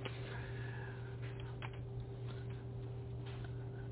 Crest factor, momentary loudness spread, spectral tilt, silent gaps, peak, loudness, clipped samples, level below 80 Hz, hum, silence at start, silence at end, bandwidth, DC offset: 16 dB; 2 LU; -6 dB/octave; none; -30 dBFS; -46 LUFS; under 0.1%; -56 dBFS; none; 0 s; 0 s; 4 kHz; under 0.1%